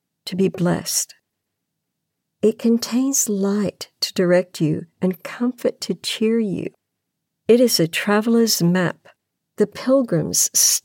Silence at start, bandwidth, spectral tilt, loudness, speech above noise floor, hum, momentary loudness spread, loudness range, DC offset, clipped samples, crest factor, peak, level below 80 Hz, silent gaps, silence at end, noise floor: 0.25 s; 17 kHz; -4 dB/octave; -19 LUFS; 59 dB; none; 9 LU; 4 LU; under 0.1%; under 0.1%; 18 dB; -2 dBFS; -66 dBFS; none; 0.05 s; -78 dBFS